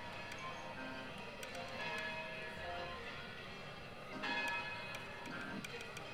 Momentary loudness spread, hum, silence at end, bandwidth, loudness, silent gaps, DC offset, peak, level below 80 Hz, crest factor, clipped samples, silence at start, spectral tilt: 9 LU; none; 0 s; 17.5 kHz; -45 LUFS; none; under 0.1%; -28 dBFS; -66 dBFS; 18 dB; under 0.1%; 0 s; -3.5 dB/octave